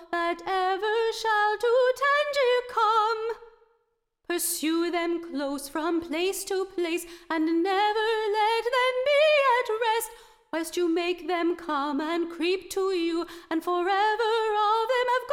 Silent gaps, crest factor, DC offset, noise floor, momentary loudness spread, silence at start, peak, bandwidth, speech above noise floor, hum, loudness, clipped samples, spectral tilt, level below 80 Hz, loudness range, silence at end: none; 14 dB; under 0.1%; -74 dBFS; 8 LU; 0 s; -12 dBFS; 17.5 kHz; 48 dB; none; -26 LUFS; under 0.1%; -1 dB/octave; -62 dBFS; 4 LU; 0 s